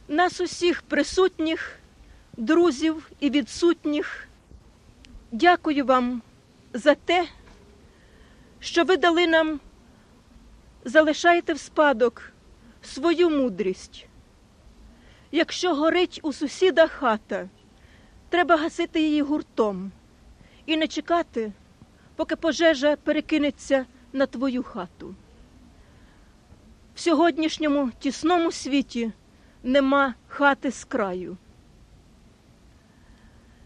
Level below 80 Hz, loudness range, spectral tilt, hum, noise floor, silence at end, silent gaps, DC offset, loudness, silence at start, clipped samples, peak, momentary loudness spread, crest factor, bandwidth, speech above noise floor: -54 dBFS; 5 LU; -4 dB/octave; none; -54 dBFS; 2.3 s; none; under 0.1%; -23 LUFS; 0.1 s; under 0.1%; -4 dBFS; 15 LU; 20 dB; 10.5 kHz; 31 dB